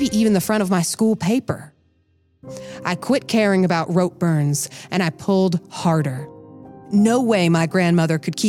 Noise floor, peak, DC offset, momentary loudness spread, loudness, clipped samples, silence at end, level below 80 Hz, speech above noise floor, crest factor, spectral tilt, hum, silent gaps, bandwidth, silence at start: -61 dBFS; -6 dBFS; under 0.1%; 11 LU; -19 LUFS; under 0.1%; 0 s; -58 dBFS; 43 dB; 14 dB; -5.5 dB/octave; none; none; 16 kHz; 0 s